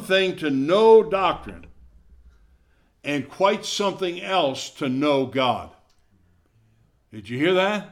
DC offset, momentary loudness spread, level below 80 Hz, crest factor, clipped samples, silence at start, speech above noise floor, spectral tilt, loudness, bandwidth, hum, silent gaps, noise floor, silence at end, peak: under 0.1%; 15 LU; -56 dBFS; 18 dB; under 0.1%; 0 s; 40 dB; -4.5 dB/octave; -21 LUFS; 13.5 kHz; none; none; -61 dBFS; 0.05 s; -4 dBFS